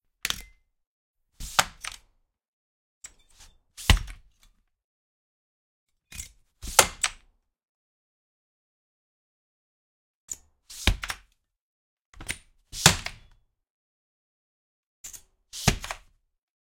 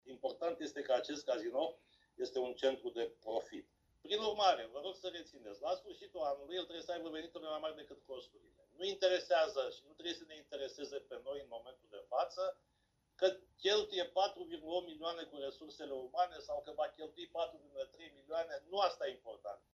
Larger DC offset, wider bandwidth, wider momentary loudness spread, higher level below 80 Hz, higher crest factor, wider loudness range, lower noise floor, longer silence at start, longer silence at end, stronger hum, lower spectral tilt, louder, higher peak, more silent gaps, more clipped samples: neither; first, 16.5 kHz vs 7.8 kHz; first, 25 LU vs 16 LU; first, -40 dBFS vs -76 dBFS; first, 32 dB vs 22 dB; first, 8 LU vs 5 LU; second, -67 dBFS vs -79 dBFS; first, 0.25 s vs 0.05 s; first, 0.75 s vs 0.15 s; neither; about the same, -2 dB/octave vs -2.5 dB/octave; first, -26 LUFS vs -40 LUFS; first, 0 dBFS vs -18 dBFS; first, 0.87-1.14 s, 2.48-3.01 s, 4.84-5.87 s, 7.63-10.28 s, 11.61-11.97 s, 12.05-12.13 s, 13.70-15.04 s vs none; neither